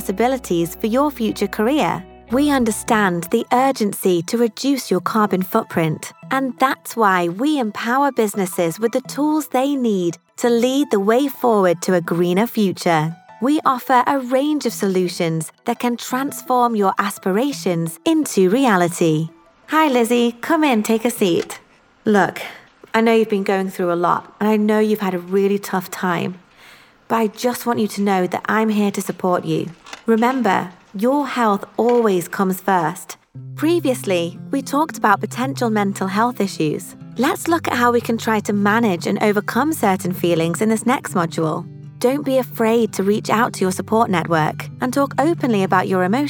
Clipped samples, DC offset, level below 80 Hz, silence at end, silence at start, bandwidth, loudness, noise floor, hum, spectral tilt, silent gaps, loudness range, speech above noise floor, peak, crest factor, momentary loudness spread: under 0.1%; under 0.1%; -56 dBFS; 0 s; 0 s; over 20 kHz; -18 LUFS; -47 dBFS; none; -5.5 dB/octave; none; 2 LU; 29 dB; 0 dBFS; 18 dB; 6 LU